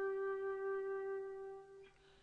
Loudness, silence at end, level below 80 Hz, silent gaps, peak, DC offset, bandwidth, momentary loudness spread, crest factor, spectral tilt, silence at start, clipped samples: -43 LUFS; 0.05 s; -78 dBFS; none; -34 dBFS; under 0.1%; 4.6 kHz; 19 LU; 10 dB; -6 dB/octave; 0 s; under 0.1%